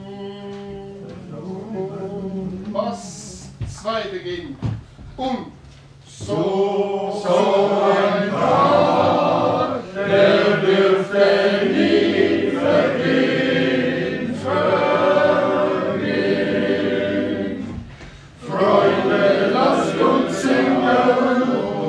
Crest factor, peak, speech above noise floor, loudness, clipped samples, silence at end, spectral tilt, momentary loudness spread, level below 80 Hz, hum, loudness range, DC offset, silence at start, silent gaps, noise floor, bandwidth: 16 dB; -2 dBFS; 23 dB; -18 LUFS; under 0.1%; 0 s; -6 dB/octave; 17 LU; -50 dBFS; none; 11 LU; under 0.1%; 0 s; none; -43 dBFS; 11 kHz